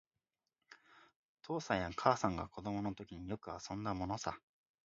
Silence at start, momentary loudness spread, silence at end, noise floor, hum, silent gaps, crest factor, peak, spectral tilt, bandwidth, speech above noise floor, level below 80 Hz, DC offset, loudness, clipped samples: 0.7 s; 12 LU; 0.45 s; under -90 dBFS; none; 1.16-1.37 s; 28 dB; -14 dBFS; -5 dB/octave; 7.6 kHz; over 51 dB; -62 dBFS; under 0.1%; -40 LUFS; under 0.1%